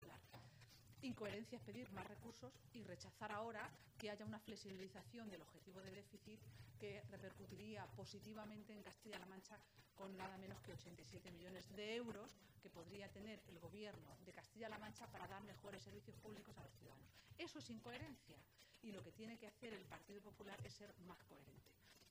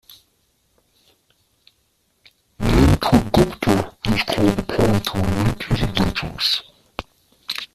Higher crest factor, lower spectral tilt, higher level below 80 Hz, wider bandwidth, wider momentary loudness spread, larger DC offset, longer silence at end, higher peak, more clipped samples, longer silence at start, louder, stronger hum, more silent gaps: about the same, 20 dB vs 18 dB; about the same, -5 dB/octave vs -6 dB/octave; second, -80 dBFS vs -32 dBFS; about the same, 15.5 kHz vs 15 kHz; about the same, 12 LU vs 14 LU; neither; about the same, 0 s vs 0.1 s; second, -36 dBFS vs -2 dBFS; neither; second, 0 s vs 2.6 s; second, -57 LUFS vs -19 LUFS; neither; neither